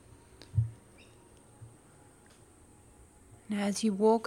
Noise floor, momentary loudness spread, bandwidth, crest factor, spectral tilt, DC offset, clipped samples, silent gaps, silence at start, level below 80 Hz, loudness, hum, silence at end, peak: -59 dBFS; 29 LU; 14 kHz; 20 dB; -6 dB/octave; under 0.1%; under 0.1%; none; 0.55 s; -60 dBFS; -32 LUFS; none; 0 s; -14 dBFS